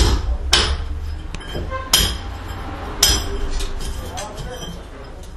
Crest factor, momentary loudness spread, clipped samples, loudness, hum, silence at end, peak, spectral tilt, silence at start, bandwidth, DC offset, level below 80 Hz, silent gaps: 22 dB; 16 LU; under 0.1%; -21 LUFS; none; 0 s; 0 dBFS; -2.5 dB/octave; 0 s; 13.5 kHz; under 0.1%; -26 dBFS; none